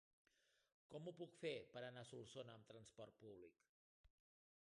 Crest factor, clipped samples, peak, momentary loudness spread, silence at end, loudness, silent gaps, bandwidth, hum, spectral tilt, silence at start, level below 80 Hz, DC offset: 22 dB; under 0.1%; -36 dBFS; 12 LU; 0.6 s; -57 LUFS; 3.69-4.04 s; 10.5 kHz; none; -5 dB/octave; 0.9 s; -88 dBFS; under 0.1%